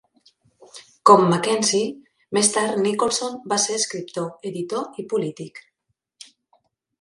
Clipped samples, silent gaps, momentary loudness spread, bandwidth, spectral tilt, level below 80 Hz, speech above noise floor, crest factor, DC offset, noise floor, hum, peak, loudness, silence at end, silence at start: under 0.1%; none; 15 LU; 11.5 kHz; -3.5 dB/octave; -68 dBFS; 55 dB; 22 dB; under 0.1%; -76 dBFS; none; 0 dBFS; -21 LUFS; 1.4 s; 0.75 s